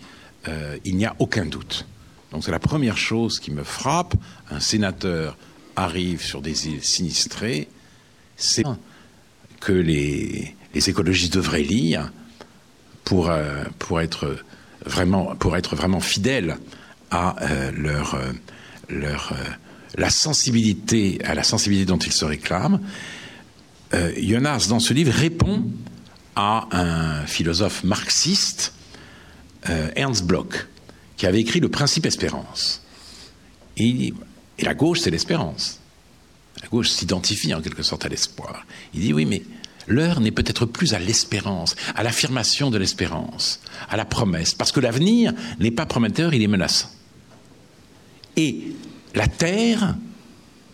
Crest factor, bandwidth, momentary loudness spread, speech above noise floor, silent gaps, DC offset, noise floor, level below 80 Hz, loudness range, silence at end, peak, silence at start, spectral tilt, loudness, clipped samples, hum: 18 dB; 16 kHz; 14 LU; 30 dB; none; under 0.1%; -52 dBFS; -44 dBFS; 4 LU; 0.4 s; -6 dBFS; 0 s; -4 dB/octave; -22 LUFS; under 0.1%; none